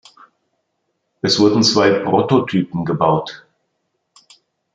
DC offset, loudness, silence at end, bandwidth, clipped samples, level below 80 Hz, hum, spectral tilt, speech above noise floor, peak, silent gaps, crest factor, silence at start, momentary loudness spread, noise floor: under 0.1%; -16 LUFS; 1.4 s; 9 kHz; under 0.1%; -58 dBFS; none; -5 dB/octave; 56 dB; -2 dBFS; none; 16 dB; 1.25 s; 9 LU; -71 dBFS